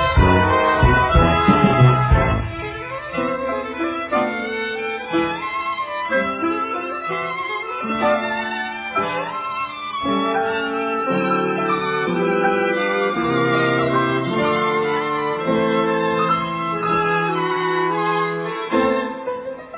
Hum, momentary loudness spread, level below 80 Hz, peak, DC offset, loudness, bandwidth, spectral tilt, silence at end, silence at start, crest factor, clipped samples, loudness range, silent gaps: none; 10 LU; -32 dBFS; -2 dBFS; under 0.1%; -19 LUFS; 4 kHz; -10 dB/octave; 0 s; 0 s; 18 dB; under 0.1%; 5 LU; none